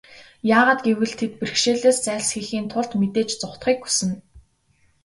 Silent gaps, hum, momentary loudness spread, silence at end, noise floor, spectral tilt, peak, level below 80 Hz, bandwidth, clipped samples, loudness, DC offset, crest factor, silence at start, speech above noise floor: none; none; 10 LU; 0.65 s; -62 dBFS; -3.5 dB/octave; -2 dBFS; -58 dBFS; 11.5 kHz; under 0.1%; -21 LUFS; under 0.1%; 20 dB; 0.1 s; 41 dB